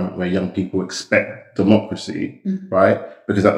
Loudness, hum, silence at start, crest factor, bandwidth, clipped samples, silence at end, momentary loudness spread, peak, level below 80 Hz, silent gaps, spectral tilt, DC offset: -20 LUFS; none; 0 s; 18 dB; 11 kHz; under 0.1%; 0 s; 10 LU; 0 dBFS; -58 dBFS; none; -6.5 dB/octave; under 0.1%